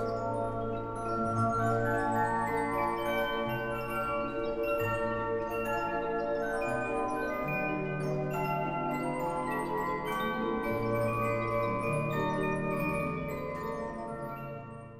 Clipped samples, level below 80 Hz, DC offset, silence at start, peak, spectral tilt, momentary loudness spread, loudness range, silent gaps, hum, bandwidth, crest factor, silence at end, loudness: under 0.1%; -52 dBFS; under 0.1%; 0 s; -18 dBFS; -6.5 dB/octave; 6 LU; 2 LU; none; none; 15.5 kHz; 14 dB; 0 s; -32 LUFS